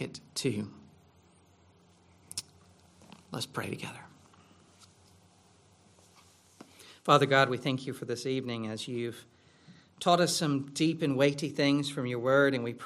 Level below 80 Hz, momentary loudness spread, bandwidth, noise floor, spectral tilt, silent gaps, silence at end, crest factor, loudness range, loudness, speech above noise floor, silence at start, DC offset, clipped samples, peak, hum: -74 dBFS; 16 LU; 15 kHz; -62 dBFS; -4.5 dB/octave; none; 0 s; 24 dB; 14 LU; -30 LUFS; 33 dB; 0 s; under 0.1%; under 0.1%; -8 dBFS; none